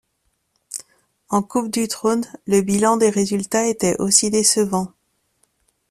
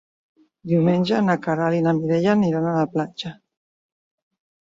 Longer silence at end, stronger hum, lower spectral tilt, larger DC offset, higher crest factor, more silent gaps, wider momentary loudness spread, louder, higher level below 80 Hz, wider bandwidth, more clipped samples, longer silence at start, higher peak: second, 1.05 s vs 1.35 s; neither; second, -3.5 dB/octave vs -8 dB/octave; neither; about the same, 20 dB vs 16 dB; neither; first, 16 LU vs 11 LU; first, -18 LUFS vs -21 LUFS; about the same, -58 dBFS vs -62 dBFS; first, 14.5 kHz vs 7.6 kHz; neither; about the same, 0.7 s vs 0.65 s; first, 0 dBFS vs -6 dBFS